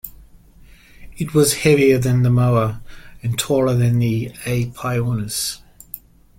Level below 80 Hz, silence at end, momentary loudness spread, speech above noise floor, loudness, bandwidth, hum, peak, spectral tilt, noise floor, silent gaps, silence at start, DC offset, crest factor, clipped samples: -44 dBFS; 0.4 s; 21 LU; 29 dB; -18 LUFS; 16.5 kHz; none; -2 dBFS; -5.5 dB/octave; -46 dBFS; none; 0.05 s; under 0.1%; 18 dB; under 0.1%